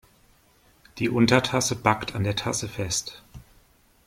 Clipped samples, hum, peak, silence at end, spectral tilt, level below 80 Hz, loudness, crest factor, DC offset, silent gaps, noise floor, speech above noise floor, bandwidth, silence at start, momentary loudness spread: under 0.1%; none; -4 dBFS; 0.7 s; -4 dB/octave; -52 dBFS; -24 LUFS; 24 dB; under 0.1%; none; -60 dBFS; 36 dB; 16.5 kHz; 0.95 s; 9 LU